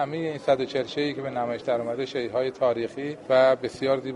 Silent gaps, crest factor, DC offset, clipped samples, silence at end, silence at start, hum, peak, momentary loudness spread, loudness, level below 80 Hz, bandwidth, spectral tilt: none; 18 dB; under 0.1%; under 0.1%; 0 s; 0 s; none; -8 dBFS; 9 LU; -26 LUFS; -64 dBFS; 11 kHz; -6 dB/octave